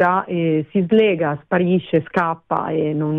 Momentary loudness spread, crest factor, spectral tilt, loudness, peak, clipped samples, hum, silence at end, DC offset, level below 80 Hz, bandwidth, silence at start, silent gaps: 6 LU; 14 dB; -9.5 dB/octave; -19 LUFS; -4 dBFS; under 0.1%; none; 0 s; under 0.1%; -58 dBFS; 4.6 kHz; 0 s; none